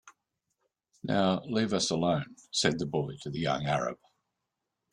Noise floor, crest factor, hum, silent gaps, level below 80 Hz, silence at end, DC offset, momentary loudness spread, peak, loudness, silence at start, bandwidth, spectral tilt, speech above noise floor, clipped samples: -85 dBFS; 20 dB; none; none; -64 dBFS; 0.95 s; under 0.1%; 8 LU; -12 dBFS; -30 LUFS; 0.05 s; 11.5 kHz; -4.5 dB/octave; 55 dB; under 0.1%